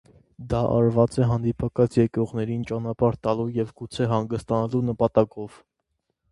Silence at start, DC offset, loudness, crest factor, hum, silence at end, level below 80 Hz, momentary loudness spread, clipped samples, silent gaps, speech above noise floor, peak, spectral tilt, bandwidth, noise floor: 0.4 s; under 0.1%; -24 LUFS; 20 dB; none; 0.85 s; -48 dBFS; 8 LU; under 0.1%; none; 54 dB; -4 dBFS; -8.5 dB/octave; 11.5 kHz; -77 dBFS